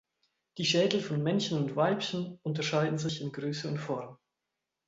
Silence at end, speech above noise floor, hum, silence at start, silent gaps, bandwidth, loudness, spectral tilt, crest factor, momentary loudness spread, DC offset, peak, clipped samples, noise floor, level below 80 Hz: 0.75 s; 56 dB; none; 0.55 s; none; 8 kHz; -31 LUFS; -5 dB/octave; 22 dB; 9 LU; under 0.1%; -10 dBFS; under 0.1%; -87 dBFS; -72 dBFS